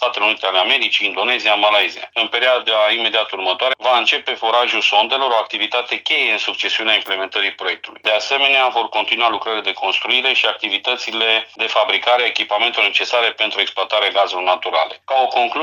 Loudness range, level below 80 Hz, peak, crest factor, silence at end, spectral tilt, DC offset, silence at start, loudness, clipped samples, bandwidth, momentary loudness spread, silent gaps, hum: 1 LU; -74 dBFS; 0 dBFS; 16 dB; 0 s; -0.5 dB/octave; under 0.1%; 0 s; -16 LUFS; under 0.1%; 16 kHz; 5 LU; none; none